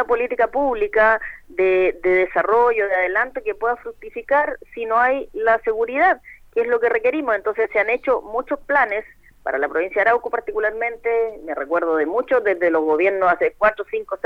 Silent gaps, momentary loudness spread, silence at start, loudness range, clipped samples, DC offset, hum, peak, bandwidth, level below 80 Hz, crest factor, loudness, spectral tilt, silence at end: none; 8 LU; 0 s; 3 LU; under 0.1%; under 0.1%; none; -2 dBFS; 5.6 kHz; -50 dBFS; 18 dB; -20 LUFS; -6 dB/octave; 0.1 s